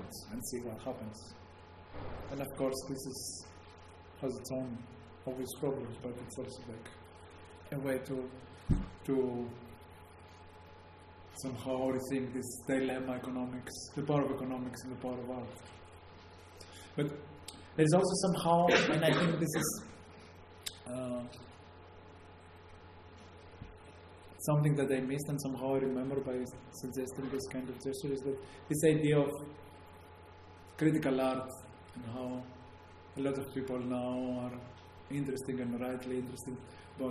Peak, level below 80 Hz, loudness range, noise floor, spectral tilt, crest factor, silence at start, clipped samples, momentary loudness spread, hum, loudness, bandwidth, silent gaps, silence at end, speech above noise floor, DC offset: -12 dBFS; -56 dBFS; 11 LU; -55 dBFS; -5.5 dB/octave; 24 dB; 0 s; under 0.1%; 24 LU; none; -36 LUFS; 13 kHz; none; 0 s; 20 dB; under 0.1%